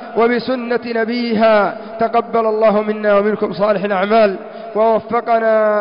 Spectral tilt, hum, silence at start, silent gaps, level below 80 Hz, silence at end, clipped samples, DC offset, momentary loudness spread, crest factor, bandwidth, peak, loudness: -10 dB/octave; none; 0 s; none; -56 dBFS; 0 s; under 0.1%; 0.3%; 6 LU; 12 dB; 5.4 kHz; -4 dBFS; -15 LUFS